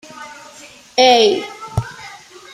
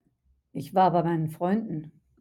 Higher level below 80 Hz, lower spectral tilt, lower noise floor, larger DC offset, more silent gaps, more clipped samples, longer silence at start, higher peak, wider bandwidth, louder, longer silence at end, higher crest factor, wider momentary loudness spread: first, -44 dBFS vs -64 dBFS; second, -4 dB/octave vs -8.5 dB/octave; second, -41 dBFS vs -69 dBFS; neither; neither; neither; second, 0.15 s vs 0.55 s; first, 0 dBFS vs -10 dBFS; second, 14 kHz vs 16 kHz; first, -15 LUFS vs -26 LUFS; about the same, 0.4 s vs 0.3 s; about the same, 18 dB vs 18 dB; first, 24 LU vs 16 LU